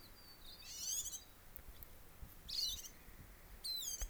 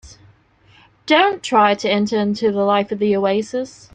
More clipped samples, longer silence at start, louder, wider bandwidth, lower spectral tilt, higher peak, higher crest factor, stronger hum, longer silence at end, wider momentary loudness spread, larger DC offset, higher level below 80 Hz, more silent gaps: neither; about the same, 0 s vs 0.05 s; second, -43 LUFS vs -17 LUFS; first, over 20 kHz vs 9.4 kHz; second, 0 dB/octave vs -5 dB/octave; second, -24 dBFS vs -2 dBFS; first, 24 dB vs 16 dB; neither; second, 0 s vs 0.25 s; first, 18 LU vs 7 LU; neither; about the same, -58 dBFS vs -56 dBFS; neither